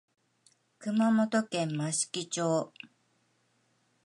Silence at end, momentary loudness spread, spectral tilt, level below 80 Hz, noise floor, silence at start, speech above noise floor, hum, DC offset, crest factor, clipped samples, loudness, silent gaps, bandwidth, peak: 1.2 s; 16 LU; -4.5 dB/octave; -82 dBFS; -72 dBFS; 0.8 s; 43 dB; none; under 0.1%; 16 dB; under 0.1%; -30 LUFS; none; 11.5 kHz; -16 dBFS